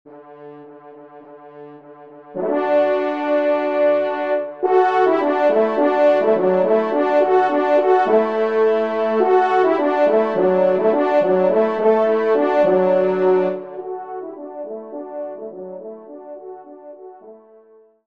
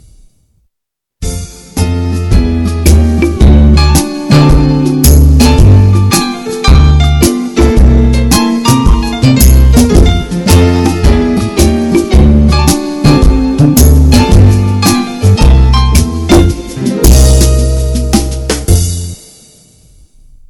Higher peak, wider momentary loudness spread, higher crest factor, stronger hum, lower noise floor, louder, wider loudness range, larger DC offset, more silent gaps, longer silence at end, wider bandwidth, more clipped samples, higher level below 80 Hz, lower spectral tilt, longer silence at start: second, -4 dBFS vs 0 dBFS; first, 17 LU vs 8 LU; first, 14 dB vs 6 dB; neither; second, -50 dBFS vs -77 dBFS; second, -17 LUFS vs -8 LUFS; first, 15 LU vs 4 LU; first, 0.2% vs under 0.1%; neither; second, 0.7 s vs 1.35 s; second, 6.2 kHz vs 19 kHz; second, under 0.1% vs 4%; second, -70 dBFS vs -10 dBFS; first, -7.5 dB/octave vs -5.5 dB/octave; second, 0.1 s vs 1.2 s